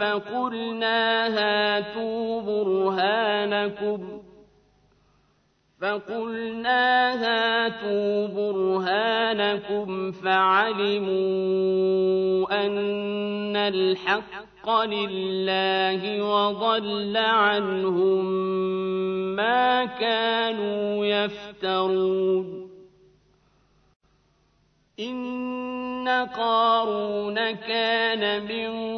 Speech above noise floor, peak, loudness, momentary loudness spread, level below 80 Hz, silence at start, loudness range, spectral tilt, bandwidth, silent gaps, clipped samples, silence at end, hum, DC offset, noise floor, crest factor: 42 dB; -8 dBFS; -24 LUFS; 8 LU; -66 dBFS; 0 s; 6 LU; -6.5 dB/octave; 6.2 kHz; 23.96-24.00 s; under 0.1%; 0 s; 50 Hz at -65 dBFS; under 0.1%; -66 dBFS; 16 dB